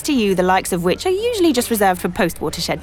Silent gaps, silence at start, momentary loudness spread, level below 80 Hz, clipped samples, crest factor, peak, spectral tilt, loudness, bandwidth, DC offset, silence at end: none; 0 s; 4 LU; -42 dBFS; under 0.1%; 12 dB; -4 dBFS; -4.5 dB/octave; -18 LUFS; 19.5 kHz; under 0.1%; 0 s